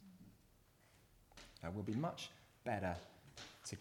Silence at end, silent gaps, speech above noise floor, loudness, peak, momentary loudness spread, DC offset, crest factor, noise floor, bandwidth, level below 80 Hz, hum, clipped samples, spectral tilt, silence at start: 0 s; none; 27 dB; -46 LUFS; -28 dBFS; 21 LU; under 0.1%; 20 dB; -70 dBFS; 19 kHz; -70 dBFS; none; under 0.1%; -5.5 dB/octave; 0 s